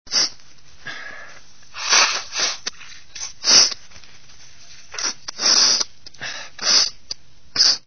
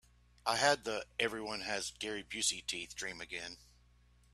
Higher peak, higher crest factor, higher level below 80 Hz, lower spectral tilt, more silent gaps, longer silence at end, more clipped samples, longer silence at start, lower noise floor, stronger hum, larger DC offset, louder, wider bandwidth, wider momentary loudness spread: first, 0 dBFS vs -14 dBFS; about the same, 22 dB vs 24 dB; first, -58 dBFS vs -66 dBFS; second, 2 dB/octave vs -1 dB/octave; neither; second, 0 s vs 0.7 s; neither; second, 0.05 s vs 0.45 s; second, -50 dBFS vs -66 dBFS; second, none vs 60 Hz at -65 dBFS; first, 1% vs under 0.1%; first, -16 LUFS vs -36 LUFS; second, 6.8 kHz vs 14.5 kHz; first, 21 LU vs 12 LU